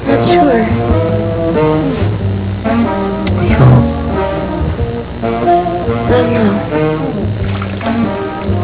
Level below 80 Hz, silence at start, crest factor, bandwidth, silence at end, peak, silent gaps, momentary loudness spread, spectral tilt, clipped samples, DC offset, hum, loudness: -24 dBFS; 0 s; 12 dB; 4 kHz; 0 s; 0 dBFS; none; 8 LU; -12 dB/octave; 0.2%; 0.4%; none; -13 LUFS